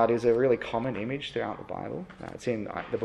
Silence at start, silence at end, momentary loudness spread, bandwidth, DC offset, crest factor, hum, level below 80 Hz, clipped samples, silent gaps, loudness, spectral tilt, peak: 0 s; 0 s; 14 LU; 10.5 kHz; under 0.1%; 18 dB; none; -58 dBFS; under 0.1%; none; -30 LUFS; -6.5 dB/octave; -10 dBFS